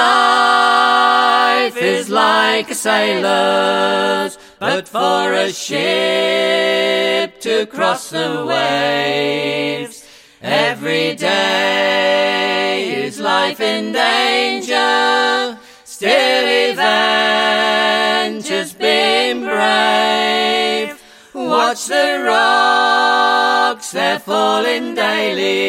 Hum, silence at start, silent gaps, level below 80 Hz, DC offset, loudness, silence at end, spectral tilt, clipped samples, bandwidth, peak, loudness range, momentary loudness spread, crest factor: none; 0 s; none; -66 dBFS; under 0.1%; -14 LUFS; 0 s; -2.5 dB/octave; under 0.1%; 16.5 kHz; 0 dBFS; 3 LU; 7 LU; 14 dB